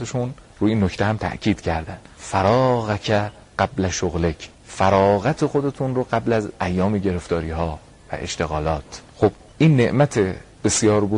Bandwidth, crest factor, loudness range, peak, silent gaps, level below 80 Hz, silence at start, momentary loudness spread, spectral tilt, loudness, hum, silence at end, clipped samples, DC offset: 11 kHz; 18 dB; 3 LU; -2 dBFS; none; -40 dBFS; 0 s; 12 LU; -5.5 dB/octave; -21 LUFS; none; 0 s; under 0.1%; under 0.1%